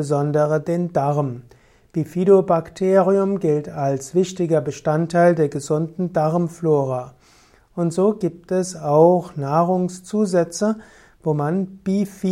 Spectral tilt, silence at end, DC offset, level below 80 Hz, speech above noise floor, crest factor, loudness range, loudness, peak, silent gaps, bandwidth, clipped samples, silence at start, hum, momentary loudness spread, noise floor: -7.5 dB/octave; 0 s; under 0.1%; -58 dBFS; 34 dB; 18 dB; 3 LU; -20 LUFS; -2 dBFS; none; 13.5 kHz; under 0.1%; 0 s; none; 10 LU; -53 dBFS